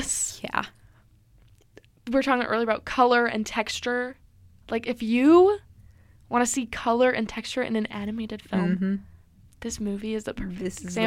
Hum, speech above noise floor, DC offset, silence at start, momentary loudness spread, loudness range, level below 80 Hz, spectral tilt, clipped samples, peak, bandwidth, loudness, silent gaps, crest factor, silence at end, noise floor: none; 33 dB; under 0.1%; 0 s; 13 LU; 6 LU; -52 dBFS; -4.5 dB/octave; under 0.1%; -6 dBFS; 16 kHz; -25 LUFS; none; 20 dB; 0 s; -57 dBFS